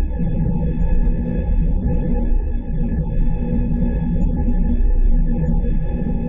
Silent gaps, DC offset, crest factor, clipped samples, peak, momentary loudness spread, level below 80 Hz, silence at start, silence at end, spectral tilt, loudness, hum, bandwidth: none; under 0.1%; 10 dB; under 0.1%; -6 dBFS; 3 LU; -18 dBFS; 0 s; 0 s; -12 dB/octave; -21 LUFS; none; 2.8 kHz